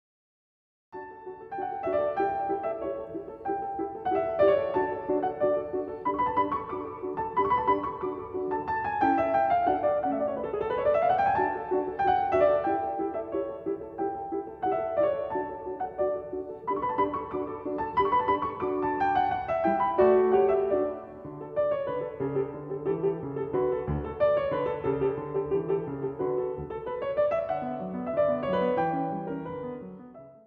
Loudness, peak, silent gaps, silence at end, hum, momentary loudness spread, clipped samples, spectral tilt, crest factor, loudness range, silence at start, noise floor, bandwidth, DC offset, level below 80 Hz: -28 LUFS; -10 dBFS; none; 0.1 s; none; 11 LU; under 0.1%; -9 dB/octave; 18 dB; 5 LU; 0.95 s; -48 dBFS; 5 kHz; under 0.1%; -54 dBFS